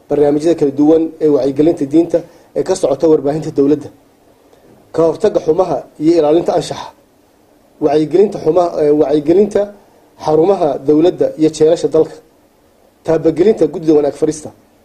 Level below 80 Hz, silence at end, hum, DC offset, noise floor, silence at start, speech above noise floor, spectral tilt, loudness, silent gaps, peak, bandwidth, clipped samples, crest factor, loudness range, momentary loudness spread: -48 dBFS; 0.35 s; none; under 0.1%; -50 dBFS; 0.1 s; 38 dB; -7 dB/octave; -13 LUFS; none; 0 dBFS; 11 kHz; under 0.1%; 14 dB; 3 LU; 7 LU